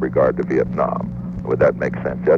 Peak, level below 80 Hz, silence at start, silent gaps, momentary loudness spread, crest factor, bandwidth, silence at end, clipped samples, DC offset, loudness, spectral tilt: -4 dBFS; -40 dBFS; 0 s; none; 8 LU; 14 dB; 6.8 kHz; 0 s; under 0.1%; under 0.1%; -20 LUFS; -9.5 dB/octave